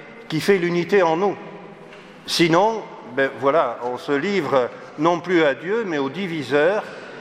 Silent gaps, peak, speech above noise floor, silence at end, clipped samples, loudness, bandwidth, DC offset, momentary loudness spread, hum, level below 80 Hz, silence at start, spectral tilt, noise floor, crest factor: none; -2 dBFS; 22 dB; 0 s; under 0.1%; -20 LUFS; 15.5 kHz; under 0.1%; 14 LU; none; -68 dBFS; 0 s; -5 dB/octave; -42 dBFS; 18 dB